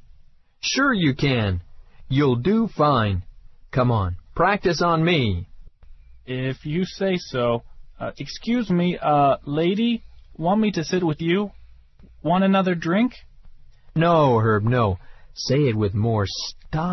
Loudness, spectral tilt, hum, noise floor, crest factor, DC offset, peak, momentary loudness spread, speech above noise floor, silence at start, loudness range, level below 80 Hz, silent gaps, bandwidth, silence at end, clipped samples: -22 LUFS; -6.5 dB/octave; none; -50 dBFS; 16 dB; under 0.1%; -6 dBFS; 11 LU; 30 dB; 0.65 s; 3 LU; -44 dBFS; none; 6.2 kHz; 0 s; under 0.1%